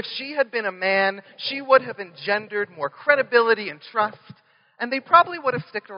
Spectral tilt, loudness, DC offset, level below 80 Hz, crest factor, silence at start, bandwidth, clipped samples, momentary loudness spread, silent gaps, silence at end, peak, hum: -1 dB/octave; -22 LUFS; under 0.1%; -80 dBFS; 22 dB; 0 s; 5.4 kHz; under 0.1%; 12 LU; none; 0 s; 0 dBFS; none